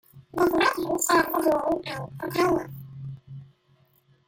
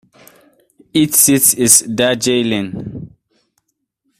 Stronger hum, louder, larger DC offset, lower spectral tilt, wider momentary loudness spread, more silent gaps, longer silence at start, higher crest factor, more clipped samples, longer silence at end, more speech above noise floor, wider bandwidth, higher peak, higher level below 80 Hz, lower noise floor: neither; second, -24 LUFS vs -12 LUFS; neither; first, -4 dB/octave vs -2.5 dB/octave; about the same, 19 LU vs 18 LU; neither; second, 0.15 s vs 0.95 s; about the same, 18 dB vs 16 dB; neither; second, 0.85 s vs 1.15 s; second, 38 dB vs 56 dB; second, 17 kHz vs over 20 kHz; second, -10 dBFS vs 0 dBFS; about the same, -56 dBFS vs -52 dBFS; second, -63 dBFS vs -69 dBFS